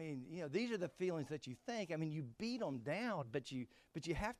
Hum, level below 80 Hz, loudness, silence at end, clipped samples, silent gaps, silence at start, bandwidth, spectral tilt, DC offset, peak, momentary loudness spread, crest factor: none; -64 dBFS; -44 LUFS; 0.05 s; under 0.1%; none; 0 s; 13.5 kHz; -6 dB/octave; under 0.1%; -28 dBFS; 6 LU; 16 dB